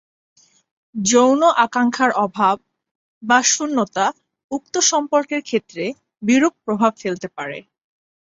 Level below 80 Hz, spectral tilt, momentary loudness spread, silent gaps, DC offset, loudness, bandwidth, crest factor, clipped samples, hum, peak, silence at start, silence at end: -66 dBFS; -2.5 dB/octave; 14 LU; 2.91-3.21 s, 4.44-4.49 s; under 0.1%; -18 LUFS; 8.2 kHz; 18 dB; under 0.1%; none; -2 dBFS; 0.95 s; 0.65 s